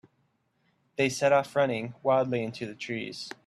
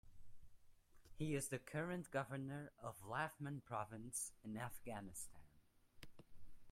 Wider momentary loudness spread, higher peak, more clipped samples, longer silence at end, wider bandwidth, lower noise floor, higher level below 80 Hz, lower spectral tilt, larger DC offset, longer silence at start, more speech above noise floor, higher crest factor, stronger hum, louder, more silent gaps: about the same, 12 LU vs 10 LU; first, -10 dBFS vs -30 dBFS; neither; first, 0.15 s vs 0 s; second, 13 kHz vs 16 kHz; about the same, -72 dBFS vs -72 dBFS; about the same, -70 dBFS vs -70 dBFS; about the same, -5 dB/octave vs -5 dB/octave; neither; first, 1 s vs 0.05 s; first, 45 dB vs 24 dB; about the same, 18 dB vs 20 dB; neither; first, -28 LUFS vs -48 LUFS; neither